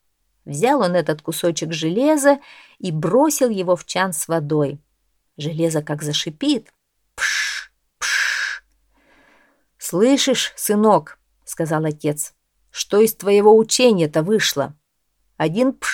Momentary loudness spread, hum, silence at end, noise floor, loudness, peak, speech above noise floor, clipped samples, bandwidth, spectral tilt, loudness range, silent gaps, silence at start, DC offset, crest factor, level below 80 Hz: 12 LU; none; 0 s; -69 dBFS; -19 LUFS; 0 dBFS; 52 dB; under 0.1%; 18 kHz; -4 dB/octave; 6 LU; none; 0.45 s; under 0.1%; 18 dB; -62 dBFS